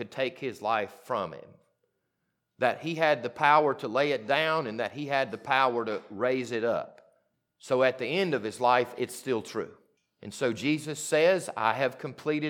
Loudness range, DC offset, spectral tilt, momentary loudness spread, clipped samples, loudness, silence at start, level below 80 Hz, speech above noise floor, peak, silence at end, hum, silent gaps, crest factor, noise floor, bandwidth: 3 LU; under 0.1%; -4.5 dB/octave; 10 LU; under 0.1%; -28 LUFS; 0 s; -80 dBFS; 52 dB; -8 dBFS; 0 s; none; none; 22 dB; -80 dBFS; 18 kHz